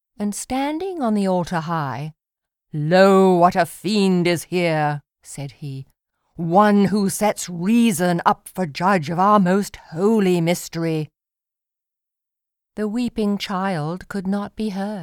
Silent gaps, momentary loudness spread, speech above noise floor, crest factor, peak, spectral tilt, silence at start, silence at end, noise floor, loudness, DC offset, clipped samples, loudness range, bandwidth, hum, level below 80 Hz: none; 16 LU; 68 dB; 20 dB; 0 dBFS; -6 dB/octave; 0.2 s; 0 s; -87 dBFS; -20 LUFS; under 0.1%; under 0.1%; 8 LU; 17.5 kHz; none; -54 dBFS